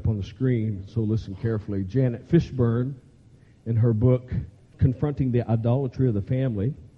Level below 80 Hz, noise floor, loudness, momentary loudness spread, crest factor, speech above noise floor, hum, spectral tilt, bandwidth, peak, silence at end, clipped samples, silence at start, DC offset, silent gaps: -46 dBFS; -53 dBFS; -25 LUFS; 7 LU; 16 dB; 29 dB; none; -10.5 dB/octave; 6.2 kHz; -8 dBFS; 0.1 s; under 0.1%; 0 s; under 0.1%; none